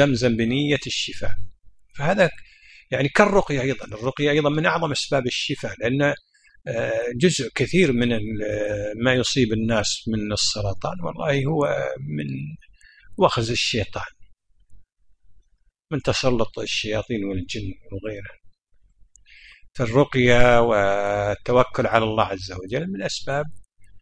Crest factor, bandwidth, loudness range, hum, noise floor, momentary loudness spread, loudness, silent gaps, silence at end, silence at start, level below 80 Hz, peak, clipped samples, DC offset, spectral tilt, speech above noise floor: 22 dB; 10.5 kHz; 7 LU; none; -62 dBFS; 13 LU; -22 LUFS; none; 0 s; 0 s; -42 dBFS; 0 dBFS; under 0.1%; under 0.1%; -5 dB/octave; 40 dB